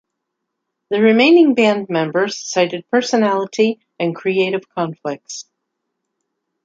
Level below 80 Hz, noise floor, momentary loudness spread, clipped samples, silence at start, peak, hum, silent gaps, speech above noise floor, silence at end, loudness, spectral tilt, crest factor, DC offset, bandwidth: -70 dBFS; -77 dBFS; 14 LU; under 0.1%; 0.9 s; -2 dBFS; none; none; 61 dB; 1.25 s; -16 LUFS; -4.5 dB/octave; 16 dB; under 0.1%; 7.8 kHz